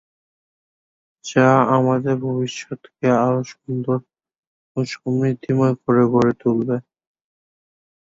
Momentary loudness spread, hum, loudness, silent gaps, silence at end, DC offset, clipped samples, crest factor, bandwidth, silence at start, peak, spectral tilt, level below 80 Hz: 12 LU; none; -19 LUFS; 4.38-4.75 s; 1.25 s; under 0.1%; under 0.1%; 18 dB; 7.8 kHz; 1.25 s; -2 dBFS; -7 dB/octave; -60 dBFS